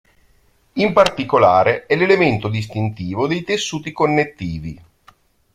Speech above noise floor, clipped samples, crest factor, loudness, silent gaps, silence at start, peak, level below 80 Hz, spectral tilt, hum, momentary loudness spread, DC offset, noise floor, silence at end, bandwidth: 40 dB; under 0.1%; 18 dB; -17 LUFS; none; 0.75 s; 0 dBFS; -48 dBFS; -5.5 dB/octave; none; 13 LU; under 0.1%; -57 dBFS; 0.8 s; 13.5 kHz